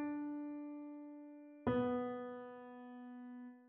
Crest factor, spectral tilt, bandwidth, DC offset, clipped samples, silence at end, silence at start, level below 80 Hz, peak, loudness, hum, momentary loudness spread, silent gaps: 20 dB; -6.5 dB/octave; 4 kHz; under 0.1%; under 0.1%; 0 s; 0 s; -72 dBFS; -24 dBFS; -44 LUFS; none; 16 LU; none